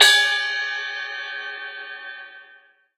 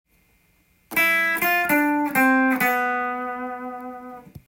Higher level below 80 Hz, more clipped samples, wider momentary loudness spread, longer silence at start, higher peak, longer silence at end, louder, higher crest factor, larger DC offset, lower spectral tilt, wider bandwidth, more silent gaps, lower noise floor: second, -88 dBFS vs -62 dBFS; neither; about the same, 19 LU vs 17 LU; second, 0 s vs 0.9 s; first, 0 dBFS vs -8 dBFS; first, 0.55 s vs 0.1 s; about the same, -22 LUFS vs -20 LUFS; first, 22 dB vs 16 dB; neither; second, 4 dB/octave vs -3.5 dB/octave; about the same, 16 kHz vs 17 kHz; neither; second, -53 dBFS vs -62 dBFS